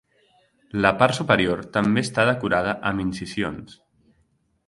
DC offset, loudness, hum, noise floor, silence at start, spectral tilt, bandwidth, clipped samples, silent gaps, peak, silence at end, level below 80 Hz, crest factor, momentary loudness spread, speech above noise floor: under 0.1%; -22 LUFS; none; -66 dBFS; 0.75 s; -5.5 dB/octave; 11.5 kHz; under 0.1%; none; 0 dBFS; 0.95 s; -50 dBFS; 24 dB; 10 LU; 44 dB